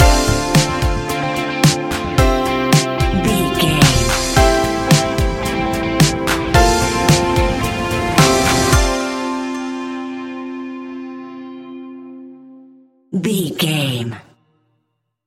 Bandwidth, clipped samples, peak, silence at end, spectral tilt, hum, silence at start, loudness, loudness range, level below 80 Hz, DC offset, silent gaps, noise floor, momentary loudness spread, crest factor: 17 kHz; under 0.1%; 0 dBFS; 1.05 s; -4.5 dB/octave; none; 0 s; -16 LUFS; 12 LU; -24 dBFS; under 0.1%; none; -70 dBFS; 17 LU; 16 dB